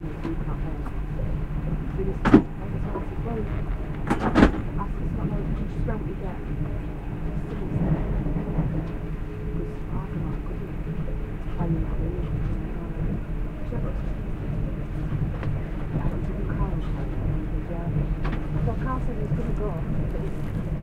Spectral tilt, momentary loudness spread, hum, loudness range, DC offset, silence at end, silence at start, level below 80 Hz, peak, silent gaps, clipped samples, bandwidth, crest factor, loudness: -9 dB/octave; 7 LU; none; 6 LU; under 0.1%; 0 s; 0 s; -30 dBFS; -2 dBFS; none; under 0.1%; 9 kHz; 24 dB; -28 LUFS